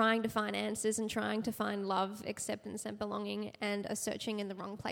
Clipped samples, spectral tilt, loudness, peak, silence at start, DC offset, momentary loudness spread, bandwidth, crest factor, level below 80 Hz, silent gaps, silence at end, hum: under 0.1%; -3.5 dB/octave; -37 LUFS; -18 dBFS; 0 s; under 0.1%; 6 LU; 17.5 kHz; 18 dB; -70 dBFS; none; 0 s; none